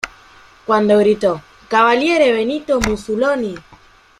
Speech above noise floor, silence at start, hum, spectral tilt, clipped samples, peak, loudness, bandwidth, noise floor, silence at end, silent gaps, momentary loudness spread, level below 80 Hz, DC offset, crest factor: 32 dB; 0.05 s; none; -5 dB/octave; under 0.1%; -2 dBFS; -16 LUFS; 13.5 kHz; -47 dBFS; 0.6 s; none; 15 LU; -40 dBFS; under 0.1%; 16 dB